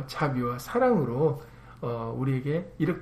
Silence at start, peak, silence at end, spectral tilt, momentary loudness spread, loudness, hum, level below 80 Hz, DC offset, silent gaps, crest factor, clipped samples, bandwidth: 0 s; -12 dBFS; 0 s; -7.5 dB/octave; 10 LU; -28 LUFS; none; -54 dBFS; under 0.1%; none; 14 dB; under 0.1%; 15 kHz